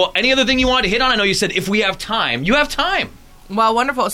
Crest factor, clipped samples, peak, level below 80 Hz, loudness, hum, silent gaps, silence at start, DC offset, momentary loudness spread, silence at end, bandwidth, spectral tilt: 14 dB; under 0.1%; -2 dBFS; -36 dBFS; -16 LUFS; none; none; 0 s; under 0.1%; 5 LU; 0 s; 16.5 kHz; -3.5 dB/octave